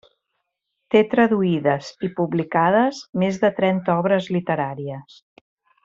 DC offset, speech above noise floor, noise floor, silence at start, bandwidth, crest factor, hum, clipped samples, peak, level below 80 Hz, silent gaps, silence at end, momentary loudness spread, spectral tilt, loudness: under 0.1%; 57 dB; -77 dBFS; 0.9 s; 7.6 kHz; 18 dB; none; under 0.1%; -4 dBFS; -62 dBFS; 3.09-3.13 s; 0.8 s; 9 LU; -7 dB/octave; -20 LUFS